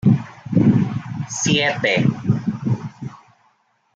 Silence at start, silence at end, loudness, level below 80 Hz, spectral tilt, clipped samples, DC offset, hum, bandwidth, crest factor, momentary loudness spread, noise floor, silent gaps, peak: 0.05 s; 0.8 s; -19 LUFS; -52 dBFS; -5 dB/octave; under 0.1%; under 0.1%; none; 9 kHz; 16 dB; 11 LU; -62 dBFS; none; -4 dBFS